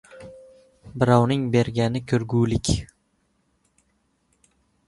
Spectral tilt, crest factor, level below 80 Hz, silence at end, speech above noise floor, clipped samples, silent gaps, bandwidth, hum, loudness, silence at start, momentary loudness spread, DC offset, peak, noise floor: -6.5 dB/octave; 22 dB; -44 dBFS; 2 s; 48 dB; under 0.1%; none; 11.5 kHz; none; -22 LUFS; 0.15 s; 24 LU; under 0.1%; -2 dBFS; -69 dBFS